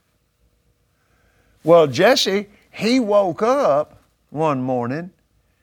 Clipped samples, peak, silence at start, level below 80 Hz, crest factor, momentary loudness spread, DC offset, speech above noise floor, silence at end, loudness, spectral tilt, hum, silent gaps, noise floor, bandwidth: under 0.1%; 0 dBFS; 1.65 s; -62 dBFS; 20 dB; 16 LU; under 0.1%; 46 dB; 0.55 s; -18 LUFS; -5 dB/octave; none; none; -63 dBFS; 18 kHz